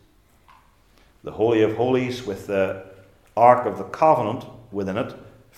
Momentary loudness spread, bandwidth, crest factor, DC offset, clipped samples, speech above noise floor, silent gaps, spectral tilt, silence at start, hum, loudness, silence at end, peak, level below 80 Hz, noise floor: 17 LU; 14 kHz; 22 dB; under 0.1%; under 0.1%; 36 dB; none; -7 dB/octave; 1.25 s; none; -21 LUFS; 0.3 s; 0 dBFS; -58 dBFS; -56 dBFS